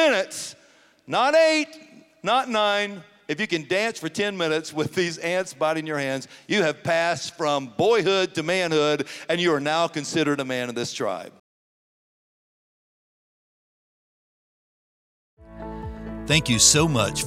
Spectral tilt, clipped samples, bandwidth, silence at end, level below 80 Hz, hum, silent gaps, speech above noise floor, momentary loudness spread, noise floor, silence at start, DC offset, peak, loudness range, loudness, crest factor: -3 dB/octave; under 0.1%; 16 kHz; 0 s; -50 dBFS; none; 11.40-15.37 s; 33 dB; 14 LU; -56 dBFS; 0 s; under 0.1%; -2 dBFS; 10 LU; -23 LUFS; 22 dB